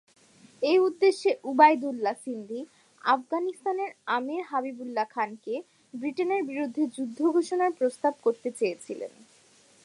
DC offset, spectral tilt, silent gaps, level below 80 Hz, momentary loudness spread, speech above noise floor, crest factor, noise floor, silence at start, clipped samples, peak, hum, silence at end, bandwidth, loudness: under 0.1%; -4 dB/octave; none; -86 dBFS; 14 LU; 32 dB; 22 dB; -59 dBFS; 0.6 s; under 0.1%; -6 dBFS; none; 0.75 s; 11.5 kHz; -27 LUFS